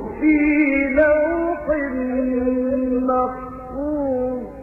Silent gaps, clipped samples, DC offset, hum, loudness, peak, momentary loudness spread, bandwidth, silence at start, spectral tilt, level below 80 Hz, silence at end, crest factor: none; under 0.1%; under 0.1%; none; -20 LUFS; -6 dBFS; 9 LU; 3 kHz; 0 s; -9.5 dB/octave; -40 dBFS; 0 s; 14 dB